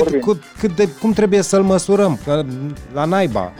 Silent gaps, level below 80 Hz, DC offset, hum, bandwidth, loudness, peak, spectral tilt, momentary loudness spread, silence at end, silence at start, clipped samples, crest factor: none; -42 dBFS; 0.3%; none; 15 kHz; -17 LUFS; -6 dBFS; -6 dB/octave; 8 LU; 0 s; 0 s; under 0.1%; 12 dB